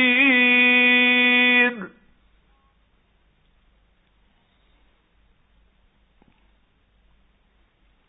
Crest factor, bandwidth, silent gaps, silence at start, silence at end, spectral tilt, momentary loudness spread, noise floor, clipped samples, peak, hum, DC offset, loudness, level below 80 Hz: 18 dB; 4 kHz; none; 0 s; 6.2 s; -7 dB/octave; 11 LU; -62 dBFS; under 0.1%; -6 dBFS; none; under 0.1%; -15 LUFS; -64 dBFS